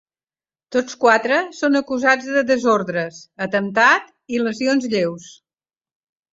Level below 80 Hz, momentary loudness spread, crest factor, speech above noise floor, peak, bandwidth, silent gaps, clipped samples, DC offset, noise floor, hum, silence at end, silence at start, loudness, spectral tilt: -64 dBFS; 10 LU; 20 dB; over 72 dB; 0 dBFS; 7.8 kHz; none; under 0.1%; under 0.1%; under -90 dBFS; none; 1 s; 0.7 s; -18 LUFS; -4.5 dB/octave